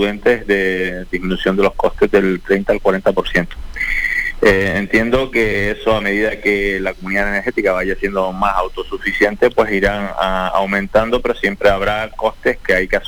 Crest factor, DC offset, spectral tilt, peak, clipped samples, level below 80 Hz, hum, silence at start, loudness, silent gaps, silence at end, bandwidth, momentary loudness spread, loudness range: 14 dB; 0.5%; -5.5 dB/octave; -2 dBFS; under 0.1%; -30 dBFS; none; 0 s; -16 LUFS; none; 0 s; over 20 kHz; 5 LU; 1 LU